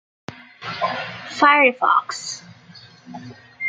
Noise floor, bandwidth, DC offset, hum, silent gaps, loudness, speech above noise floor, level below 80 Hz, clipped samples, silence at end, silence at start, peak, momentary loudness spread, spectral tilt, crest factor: -46 dBFS; 9.4 kHz; under 0.1%; none; none; -18 LUFS; 27 dB; -70 dBFS; under 0.1%; 0 s; 0.3 s; -2 dBFS; 25 LU; -3 dB/octave; 20 dB